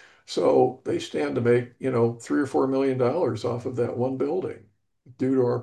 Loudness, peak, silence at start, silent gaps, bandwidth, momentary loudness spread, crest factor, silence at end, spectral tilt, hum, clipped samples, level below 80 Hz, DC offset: -25 LUFS; -8 dBFS; 0.3 s; none; 10.5 kHz; 8 LU; 18 dB; 0 s; -7 dB/octave; none; under 0.1%; -64 dBFS; under 0.1%